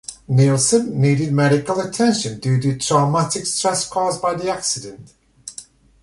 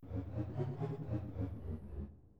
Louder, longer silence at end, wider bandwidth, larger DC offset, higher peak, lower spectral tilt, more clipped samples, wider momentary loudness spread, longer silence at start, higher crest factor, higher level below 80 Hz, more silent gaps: first, -18 LUFS vs -43 LUFS; first, 0.4 s vs 0 s; first, 11.5 kHz vs 5.6 kHz; second, under 0.1% vs 0.2%; first, -2 dBFS vs -26 dBFS; second, -5 dB/octave vs -10.5 dB/octave; neither; first, 16 LU vs 6 LU; about the same, 0.1 s vs 0 s; about the same, 16 dB vs 16 dB; about the same, -52 dBFS vs -52 dBFS; neither